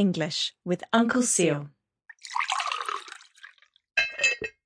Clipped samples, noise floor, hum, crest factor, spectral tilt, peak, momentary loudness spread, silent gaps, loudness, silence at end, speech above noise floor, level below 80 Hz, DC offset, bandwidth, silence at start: under 0.1%; -53 dBFS; none; 20 dB; -3 dB/octave; -8 dBFS; 17 LU; none; -26 LUFS; 0.15 s; 28 dB; -68 dBFS; under 0.1%; 10.5 kHz; 0 s